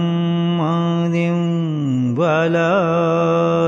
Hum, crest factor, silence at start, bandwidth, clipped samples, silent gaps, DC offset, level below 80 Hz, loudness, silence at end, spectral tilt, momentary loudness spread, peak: none; 12 dB; 0 s; 7.4 kHz; under 0.1%; none; under 0.1%; -64 dBFS; -17 LUFS; 0 s; -8 dB/octave; 3 LU; -6 dBFS